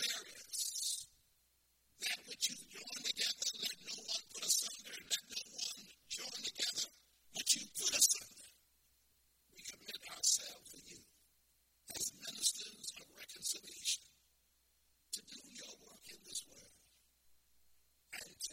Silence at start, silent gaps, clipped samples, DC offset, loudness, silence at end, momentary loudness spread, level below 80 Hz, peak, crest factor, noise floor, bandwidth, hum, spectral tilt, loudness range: 0 s; none; under 0.1%; under 0.1%; -38 LUFS; 0 s; 19 LU; -80 dBFS; -16 dBFS; 28 dB; -76 dBFS; 16.5 kHz; none; 2 dB/octave; 13 LU